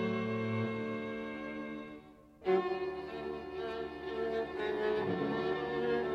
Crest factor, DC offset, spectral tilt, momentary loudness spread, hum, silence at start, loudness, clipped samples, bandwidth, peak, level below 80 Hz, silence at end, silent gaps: 18 dB; under 0.1%; -7.5 dB/octave; 8 LU; none; 0 s; -36 LUFS; under 0.1%; 7.4 kHz; -18 dBFS; -64 dBFS; 0 s; none